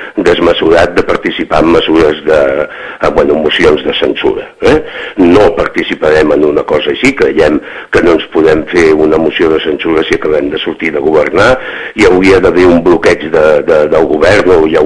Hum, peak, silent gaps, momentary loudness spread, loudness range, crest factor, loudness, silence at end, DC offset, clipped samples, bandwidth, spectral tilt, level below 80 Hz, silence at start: none; 0 dBFS; none; 7 LU; 2 LU; 8 dB; -8 LUFS; 0 s; under 0.1%; 5%; 11 kHz; -5.5 dB/octave; -30 dBFS; 0 s